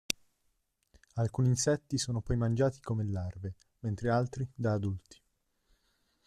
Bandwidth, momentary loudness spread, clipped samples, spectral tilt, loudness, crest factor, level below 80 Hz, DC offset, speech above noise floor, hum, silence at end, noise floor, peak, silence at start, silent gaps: 14 kHz; 12 LU; under 0.1%; -5.5 dB/octave; -33 LUFS; 26 dB; -54 dBFS; under 0.1%; 45 dB; none; 1.3 s; -77 dBFS; -6 dBFS; 0.1 s; none